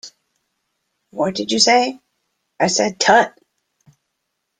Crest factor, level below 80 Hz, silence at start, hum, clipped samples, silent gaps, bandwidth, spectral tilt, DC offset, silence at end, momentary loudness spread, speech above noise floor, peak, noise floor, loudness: 20 dB; -64 dBFS; 0.05 s; none; under 0.1%; none; 10.5 kHz; -2 dB/octave; under 0.1%; 1.3 s; 11 LU; 59 dB; -2 dBFS; -75 dBFS; -16 LUFS